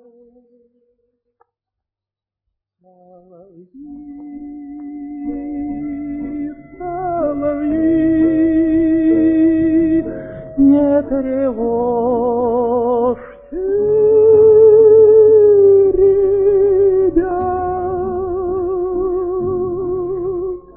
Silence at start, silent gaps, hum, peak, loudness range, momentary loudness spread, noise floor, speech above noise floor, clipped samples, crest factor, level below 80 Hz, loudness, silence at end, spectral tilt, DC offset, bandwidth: 3.75 s; none; none; -2 dBFS; 17 LU; 19 LU; -87 dBFS; 71 dB; under 0.1%; 14 dB; -40 dBFS; -14 LUFS; 0.15 s; -13 dB/octave; under 0.1%; 3.4 kHz